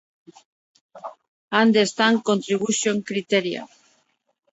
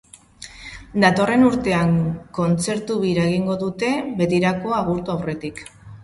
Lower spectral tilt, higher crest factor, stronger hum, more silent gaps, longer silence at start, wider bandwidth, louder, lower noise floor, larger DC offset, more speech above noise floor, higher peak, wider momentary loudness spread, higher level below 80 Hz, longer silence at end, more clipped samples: second, -3.5 dB/octave vs -6 dB/octave; about the same, 20 dB vs 20 dB; neither; first, 1.28-1.48 s vs none; first, 0.95 s vs 0.4 s; second, 8.2 kHz vs 11.5 kHz; about the same, -21 LUFS vs -20 LUFS; first, -70 dBFS vs -43 dBFS; neither; first, 49 dB vs 23 dB; about the same, -4 dBFS vs -2 dBFS; about the same, 22 LU vs 20 LU; second, -72 dBFS vs -48 dBFS; first, 0.85 s vs 0 s; neither